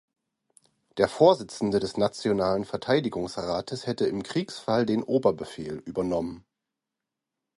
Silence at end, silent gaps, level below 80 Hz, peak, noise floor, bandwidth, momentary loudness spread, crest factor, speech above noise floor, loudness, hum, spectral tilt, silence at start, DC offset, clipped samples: 1.2 s; none; -58 dBFS; -6 dBFS; -87 dBFS; 11.5 kHz; 13 LU; 22 dB; 61 dB; -27 LUFS; none; -6 dB/octave; 0.95 s; under 0.1%; under 0.1%